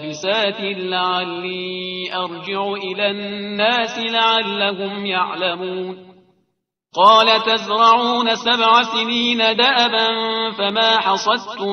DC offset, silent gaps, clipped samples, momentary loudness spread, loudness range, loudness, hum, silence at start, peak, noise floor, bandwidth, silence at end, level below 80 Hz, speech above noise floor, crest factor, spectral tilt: under 0.1%; none; under 0.1%; 12 LU; 7 LU; -17 LUFS; none; 0 s; 0 dBFS; -72 dBFS; 7.6 kHz; 0 s; -68 dBFS; 54 dB; 18 dB; -3.5 dB/octave